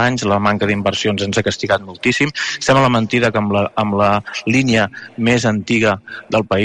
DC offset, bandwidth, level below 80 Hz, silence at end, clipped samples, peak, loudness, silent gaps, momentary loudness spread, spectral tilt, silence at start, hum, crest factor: under 0.1%; 11 kHz; -46 dBFS; 0 s; under 0.1%; -2 dBFS; -16 LUFS; none; 5 LU; -5 dB/octave; 0 s; none; 14 dB